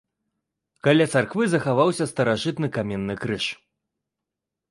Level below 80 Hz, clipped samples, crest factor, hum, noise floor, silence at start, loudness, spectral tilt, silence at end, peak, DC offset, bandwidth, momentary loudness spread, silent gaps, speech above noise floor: -58 dBFS; under 0.1%; 18 dB; none; -85 dBFS; 0.85 s; -23 LUFS; -5.5 dB/octave; 1.15 s; -6 dBFS; under 0.1%; 11.5 kHz; 9 LU; none; 63 dB